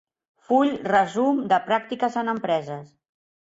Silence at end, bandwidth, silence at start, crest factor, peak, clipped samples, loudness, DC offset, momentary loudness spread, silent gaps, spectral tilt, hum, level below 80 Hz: 0.65 s; 8 kHz; 0.5 s; 18 dB; -6 dBFS; under 0.1%; -23 LUFS; under 0.1%; 6 LU; none; -6 dB/octave; none; -66 dBFS